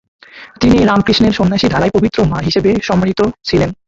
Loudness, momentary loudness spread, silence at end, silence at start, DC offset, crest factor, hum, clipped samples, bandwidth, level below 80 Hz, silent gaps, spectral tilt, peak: -13 LUFS; 5 LU; 0.15 s; 0.35 s; under 0.1%; 12 dB; none; under 0.1%; 7.8 kHz; -32 dBFS; none; -6.5 dB/octave; 0 dBFS